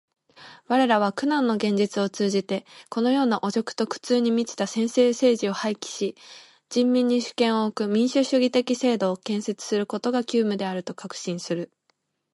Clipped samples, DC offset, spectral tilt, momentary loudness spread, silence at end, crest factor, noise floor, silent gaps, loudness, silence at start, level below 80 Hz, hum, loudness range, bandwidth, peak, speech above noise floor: under 0.1%; under 0.1%; -5 dB/octave; 10 LU; 0.7 s; 16 dB; -72 dBFS; none; -24 LUFS; 0.4 s; -74 dBFS; none; 2 LU; 11.5 kHz; -8 dBFS; 48 dB